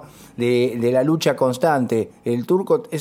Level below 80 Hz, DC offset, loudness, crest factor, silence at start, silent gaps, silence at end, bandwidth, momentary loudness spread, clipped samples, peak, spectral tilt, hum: -62 dBFS; under 0.1%; -20 LUFS; 14 dB; 0 s; none; 0 s; 16 kHz; 6 LU; under 0.1%; -4 dBFS; -6 dB/octave; none